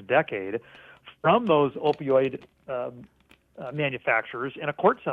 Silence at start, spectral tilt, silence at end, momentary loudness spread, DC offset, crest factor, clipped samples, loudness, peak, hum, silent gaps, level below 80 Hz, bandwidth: 0 s; -8 dB/octave; 0 s; 14 LU; under 0.1%; 18 dB; under 0.1%; -26 LUFS; -8 dBFS; none; none; -66 dBFS; 4.9 kHz